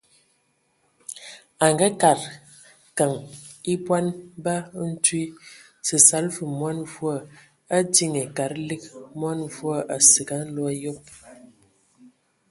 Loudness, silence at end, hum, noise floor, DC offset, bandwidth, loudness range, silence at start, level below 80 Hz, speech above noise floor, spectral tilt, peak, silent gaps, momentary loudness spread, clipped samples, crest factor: -21 LUFS; 1.05 s; none; -68 dBFS; under 0.1%; 12 kHz; 4 LU; 1.1 s; -66 dBFS; 45 dB; -3 dB/octave; 0 dBFS; none; 21 LU; under 0.1%; 24 dB